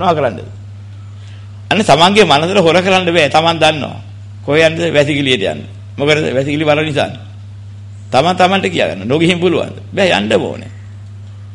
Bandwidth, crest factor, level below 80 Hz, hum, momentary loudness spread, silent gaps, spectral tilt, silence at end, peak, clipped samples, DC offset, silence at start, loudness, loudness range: 11.5 kHz; 14 dB; -46 dBFS; none; 22 LU; none; -5 dB/octave; 0 s; 0 dBFS; under 0.1%; under 0.1%; 0 s; -12 LUFS; 4 LU